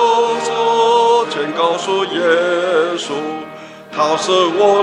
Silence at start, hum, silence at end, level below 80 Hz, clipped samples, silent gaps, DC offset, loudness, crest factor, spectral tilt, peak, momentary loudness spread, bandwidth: 0 s; none; 0 s; -66 dBFS; under 0.1%; none; under 0.1%; -15 LUFS; 14 dB; -3 dB/octave; 0 dBFS; 12 LU; 11 kHz